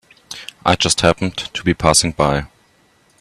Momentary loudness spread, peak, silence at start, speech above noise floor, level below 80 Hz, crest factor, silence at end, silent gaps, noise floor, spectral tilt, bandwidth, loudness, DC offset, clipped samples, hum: 16 LU; 0 dBFS; 0.3 s; 39 dB; -38 dBFS; 18 dB; 0.75 s; none; -56 dBFS; -3.5 dB/octave; 14 kHz; -16 LUFS; under 0.1%; under 0.1%; none